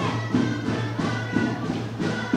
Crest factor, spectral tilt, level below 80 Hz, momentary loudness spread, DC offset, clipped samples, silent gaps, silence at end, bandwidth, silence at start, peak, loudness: 16 dB; -6.5 dB/octave; -52 dBFS; 3 LU; under 0.1%; under 0.1%; none; 0 s; 10.5 kHz; 0 s; -10 dBFS; -26 LUFS